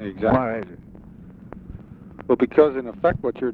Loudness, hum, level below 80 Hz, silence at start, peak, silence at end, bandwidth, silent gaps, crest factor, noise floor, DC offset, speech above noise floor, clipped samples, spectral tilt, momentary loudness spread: -21 LUFS; none; -46 dBFS; 0 s; -2 dBFS; 0 s; 4.6 kHz; none; 20 dB; -43 dBFS; under 0.1%; 22 dB; under 0.1%; -10 dB/octave; 24 LU